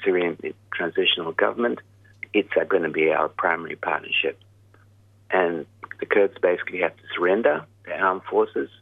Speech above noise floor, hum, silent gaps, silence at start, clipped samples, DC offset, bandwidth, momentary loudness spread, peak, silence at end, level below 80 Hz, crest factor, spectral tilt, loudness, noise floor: 31 dB; none; none; 0 s; under 0.1%; under 0.1%; 3.9 kHz; 9 LU; -4 dBFS; 0.15 s; -70 dBFS; 20 dB; -6.5 dB/octave; -23 LUFS; -55 dBFS